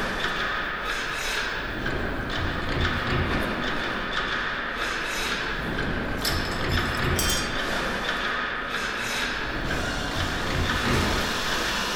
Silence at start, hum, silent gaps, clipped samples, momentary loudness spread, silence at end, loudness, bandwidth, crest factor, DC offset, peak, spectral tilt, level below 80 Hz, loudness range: 0 s; none; none; under 0.1%; 4 LU; 0 s; -26 LUFS; over 20 kHz; 16 dB; under 0.1%; -10 dBFS; -3.5 dB/octave; -36 dBFS; 1 LU